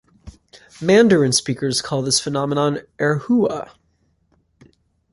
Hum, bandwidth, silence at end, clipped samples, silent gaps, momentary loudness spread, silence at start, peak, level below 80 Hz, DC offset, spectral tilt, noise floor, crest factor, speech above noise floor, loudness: none; 11.5 kHz; 1.5 s; under 0.1%; none; 9 LU; 0.25 s; -2 dBFS; -54 dBFS; under 0.1%; -4.5 dB/octave; -64 dBFS; 18 dB; 46 dB; -18 LUFS